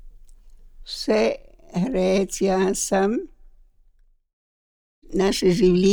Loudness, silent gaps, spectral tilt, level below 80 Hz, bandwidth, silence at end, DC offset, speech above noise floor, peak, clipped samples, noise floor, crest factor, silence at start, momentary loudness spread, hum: -22 LUFS; 4.33-5.02 s; -5 dB/octave; -44 dBFS; 18.5 kHz; 0 s; under 0.1%; 37 dB; -8 dBFS; under 0.1%; -58 dBFS; 16 dB; 0.05 s; 13 LU; none